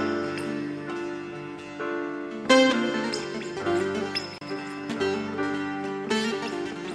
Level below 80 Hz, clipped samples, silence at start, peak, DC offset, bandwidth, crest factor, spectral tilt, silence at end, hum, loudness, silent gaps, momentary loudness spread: -66 dBFS; under 0.1%; 0 s; -6 dBFS; under 0.1%; 12.5 kHz; 22 dB; -4 dB/octave; 0 s; none; -28 LUFS; none; 13 LU